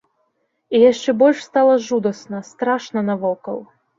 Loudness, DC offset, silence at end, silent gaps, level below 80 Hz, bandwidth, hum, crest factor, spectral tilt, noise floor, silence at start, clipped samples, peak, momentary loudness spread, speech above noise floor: -18 LUFS; under 0.1%; 0.35 s; none; -66 dBFS; 7.6 kHz; none; 16 dB; -5.5 dB/octave; -68 dBFS; 0.7 s; under 0.1%; -2 dBFS; 15 LU; 51 dB